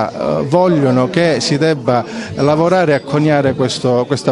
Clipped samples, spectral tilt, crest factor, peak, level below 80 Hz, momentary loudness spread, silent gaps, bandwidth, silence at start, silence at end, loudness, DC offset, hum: under 0.1%; -6 dB/octave; 14 dB; 0 dBFS; -48 dBFS; 5 LU; none; 11.5 kHz; 0 s; 0 s; -14 LUFS; under 0.1%; none